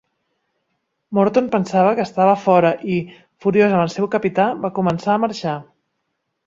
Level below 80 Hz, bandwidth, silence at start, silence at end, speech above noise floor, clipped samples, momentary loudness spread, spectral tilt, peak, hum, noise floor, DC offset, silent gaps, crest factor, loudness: -60 dBFS; 7.6 kHz; 1.1 s; 0.85 s; 57 dB; under 0.1%; 9 LU; -7 dB/octave; -2 dBFS; none; -74 dBFS; under 0.1%; none; 18 dB; -18 LUFS